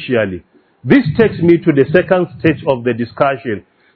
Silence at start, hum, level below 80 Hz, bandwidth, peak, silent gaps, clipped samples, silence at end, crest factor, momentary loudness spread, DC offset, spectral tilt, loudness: 0 s; none; -46 dBFS; 5.4 kHz; 0 dBFS; none; 0.3%; 0.35 s; 14 dB; 12 LU; under 0.1%; -10 dB/octave; -14 LUFS